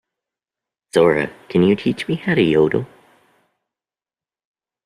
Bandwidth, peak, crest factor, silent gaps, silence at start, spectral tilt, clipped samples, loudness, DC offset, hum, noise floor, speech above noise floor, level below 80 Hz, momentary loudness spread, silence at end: 12.5 kHz; -2 dBFS; 18 dB; none; 0.95 s; -7 dB/octave; under 0.1%; -18 LUFS; under 0.1%; none; under -90 dBFS; over 73 dB; -54 dBFS; 7 LU; 2 s